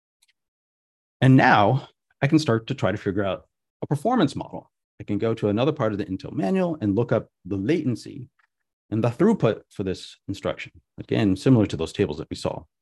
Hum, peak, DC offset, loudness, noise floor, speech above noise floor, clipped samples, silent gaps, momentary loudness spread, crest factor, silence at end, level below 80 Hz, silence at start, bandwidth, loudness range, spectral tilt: none; -4 dBFS; under 0.1%; -23 LUFS; under -90 dBFS; over 67 dB; under 0.1%; 3.70-3.80 s, 4.84-4.98 s, 8.73-8.89 s; 16 LU; 20 dB; 0.2 s; -50 dBFS; 1.2 s; 12 kHz; 4 LU; -7 dB/octave